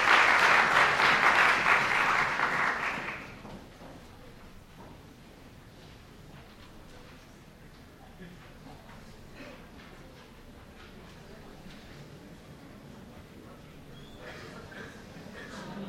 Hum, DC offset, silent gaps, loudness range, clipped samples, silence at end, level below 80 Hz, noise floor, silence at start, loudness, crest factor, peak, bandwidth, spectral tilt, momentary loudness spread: none; under 0.1%; none; 26 LU; under 0.1%; 0 s; -56 dBFS; -52 dBFS; 0 s; -24 LUFS; 22 dB; -10 dBFS; 16 kHz; -2.5 dB/octave; 28 LU